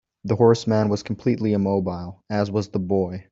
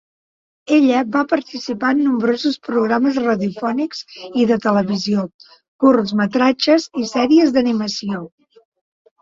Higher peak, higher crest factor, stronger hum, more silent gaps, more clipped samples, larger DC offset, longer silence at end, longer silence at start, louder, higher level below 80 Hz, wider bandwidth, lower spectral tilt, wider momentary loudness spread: about the same, -4 dBFS vs -2 dBFS; about the same, 18 dB vs 16 dB; neither; second, none vs 5.34-5.39 s, 5.68-5.79 s; neither; neither; second, 0.1 s vs 0.95 s; second, 0.25 s vs 0.7 s; second, -22 LUFS vs -17 LUFS; about the same, -58 dBFS vs -60 dBFS; about the same, 7.8 kHz vs 7.6 kHz; first, -7.5 dB/octave vs -5.5 dB/octave; about the same, 9 LU vs 10 LU